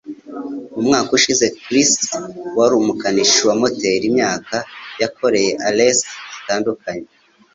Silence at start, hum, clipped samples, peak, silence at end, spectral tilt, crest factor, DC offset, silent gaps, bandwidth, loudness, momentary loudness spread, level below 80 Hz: 0.05 s; none; under 0.1%; 0 dBFS; 0.5 s; -2.5 dB/octave; 16 dB; under 0.1%; none; 7.8 kHz; -16 LUFS; 15 LU; -58 dBFS